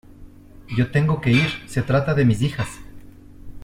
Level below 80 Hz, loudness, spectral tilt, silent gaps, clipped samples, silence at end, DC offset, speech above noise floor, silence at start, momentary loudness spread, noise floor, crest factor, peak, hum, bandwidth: -44 dBFS; -21 LUFS; -7 dB/octave; none; under 0.1%; 0 s; under 0.1%; 23 dB; 0.2 s; 11 LU; -43 dBFS; 16 dB; -4 dBFS; none; 15 kHz